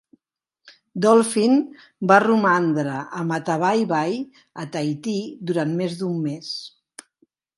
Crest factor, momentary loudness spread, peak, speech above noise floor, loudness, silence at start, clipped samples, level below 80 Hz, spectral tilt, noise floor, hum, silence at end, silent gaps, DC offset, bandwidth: 22 dB; 15 LU; 0 dBFS; 58 dB; -21 LUFS; 0.65 s; under 0.1%; -72 dBFS; -5.5 dB/octave; -79 dBFS; none; 0.9 s; none; under 0.1%; 11.5 kHz